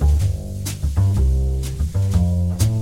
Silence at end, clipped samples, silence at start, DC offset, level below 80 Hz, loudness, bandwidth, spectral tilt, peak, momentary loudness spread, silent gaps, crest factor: 0 s; under 0.1%; 0 s; under 0.1%; -22 dBFS; -21 LUFS; 16 kHz; -6.5 dB/octave; -6 dBFS; 6 LU; none; 12 dB